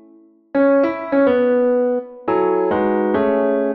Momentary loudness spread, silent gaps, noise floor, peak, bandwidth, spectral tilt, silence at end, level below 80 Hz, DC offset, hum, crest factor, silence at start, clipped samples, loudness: 6 LU; none; -49 dBFS; -4 dBFS; 4.9 kHz; -9.5 dB/octave; 0 s; -56 dBFS; under 0.1%; none; 12 dB; 0.55 s; under 0.1%; -17 LUFS